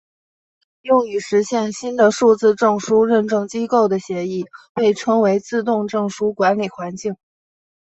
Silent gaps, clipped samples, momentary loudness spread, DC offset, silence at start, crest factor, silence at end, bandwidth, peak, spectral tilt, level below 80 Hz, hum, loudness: 4.69-4.75 s; under 0.1%; 12 LU; under 0.1%; 0.85 s; 16 dB; 0.7 s; 8.2 kHz; -2 dBFS; -5.5 dB/octave; -62 dBFS; none; -18 LUFS